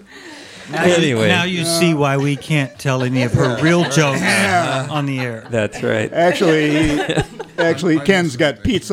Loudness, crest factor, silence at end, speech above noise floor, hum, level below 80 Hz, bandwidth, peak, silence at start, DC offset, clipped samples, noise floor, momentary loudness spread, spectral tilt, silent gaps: -16 LUFS; 16 dB; 0 s; 21 dB; none; -42 dBFS; 16 kHz; 0 dBFS; 0.1 s; under 0.1%; under 0.1%; -37 dBFS; 7 LU; -5 dB/octave; none